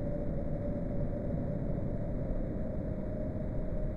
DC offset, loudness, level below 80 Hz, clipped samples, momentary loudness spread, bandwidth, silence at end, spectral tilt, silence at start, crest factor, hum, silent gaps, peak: under 0.1%; -37 LUFS; -38 dBFS; under 0.1%; 2 LU; 4.1 kHz; 0 s; -11.5 dB/octave; 0 s; 12 dB; none; none; -22 dBFS